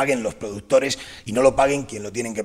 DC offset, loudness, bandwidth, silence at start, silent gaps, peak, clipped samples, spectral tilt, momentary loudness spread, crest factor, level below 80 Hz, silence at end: under 0.1%; -21 LUFS; 14 kHz; 0 s; none; -4 dBFS; under 0.1%; -4 dB/octave; 12 LU; 18 dB; -48 dBFS; 0 s